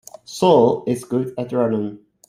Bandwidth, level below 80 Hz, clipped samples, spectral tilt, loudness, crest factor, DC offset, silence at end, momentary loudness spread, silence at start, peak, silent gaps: 15 kHz; -60 dBFS; under 0.1%; -6.5 dB/octave; -19 LUFS; 18 dB; under 0.1%; 0.3 s; 12 LU; 0.3 s; -2 dBFS; none